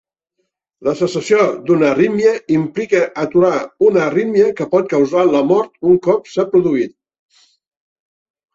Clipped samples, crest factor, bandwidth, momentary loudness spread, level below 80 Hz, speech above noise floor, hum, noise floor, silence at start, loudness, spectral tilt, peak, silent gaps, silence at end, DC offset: under 0.1%; 14 dB; 8 kHz; 5 LU; -58 dBFS; 57 dB; none; -71 dBFS; 0.8 s; -15 LUFS; -6.5 dB/octave; -2 dBFS; none; 1.65 s; under 0.1%